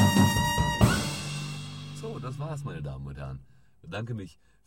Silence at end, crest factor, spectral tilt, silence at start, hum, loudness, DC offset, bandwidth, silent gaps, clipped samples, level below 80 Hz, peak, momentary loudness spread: 0.35 s; 22 dB; -5 dB/octave; 0 s; none; -29 LUFS; 0.2%; 16.5 kHz; none; under 0.1%; -42 dBFS; -6 dBFS; 16 LU